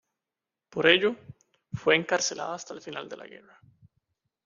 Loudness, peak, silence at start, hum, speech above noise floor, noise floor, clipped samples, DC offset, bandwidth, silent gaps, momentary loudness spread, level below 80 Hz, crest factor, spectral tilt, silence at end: -25 LUFS; -4 dBFS; 0.75 s; none; 61 dB; -89 dBFS; under 0.1%; under 0.1%; 7.4 kHz; none; 21 LU; -68 dBFS; 26 dB; -3 dB/octave; 1.2 s